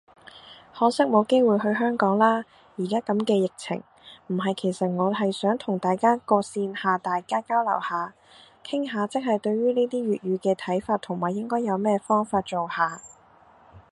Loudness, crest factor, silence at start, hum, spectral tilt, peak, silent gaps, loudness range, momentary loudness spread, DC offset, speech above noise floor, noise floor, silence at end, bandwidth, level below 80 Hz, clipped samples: -25 LUFS; 20 dB; 0.35 s; none; -6 dB/octave; -6 dBFS; none; 3 LU; 10 LU; under 0.1%; 31 dB; -55 dBFS; 0.1 s; 11.5 kHz; -68 dBFS; under 0.1%